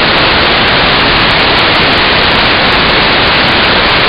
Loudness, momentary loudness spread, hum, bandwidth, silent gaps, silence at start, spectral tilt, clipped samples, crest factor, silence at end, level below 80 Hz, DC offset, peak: -6 LUFS; 0 LU; none; 15.5 kHz; none; 0 s; -5.5 dB/octave; 0.2%; 8 dB; 0 s; -24 dBFS; under 0.1%; 0 dBFS